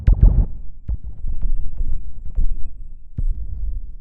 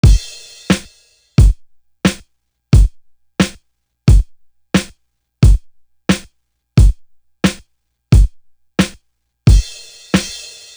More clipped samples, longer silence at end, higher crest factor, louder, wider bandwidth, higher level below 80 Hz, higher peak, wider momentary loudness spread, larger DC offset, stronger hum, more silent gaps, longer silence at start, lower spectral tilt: neither; second, 0 s vs 0.4 s; about the same, 16 dB vs 14 dB; second, -26 LUFS vs -16 LUFS; second, 1.8 kHz vs over 20 kHz; about the same, -20 dBFS vs -18 dBFS; about the same, 0 dBFS vs 0 dBFS; about the same, 17 LU vs 16 LU; neither; neither; neither; about the same, 0 s vs 0.05 s; first, -11.5 dB/octave vs -6 dB/octave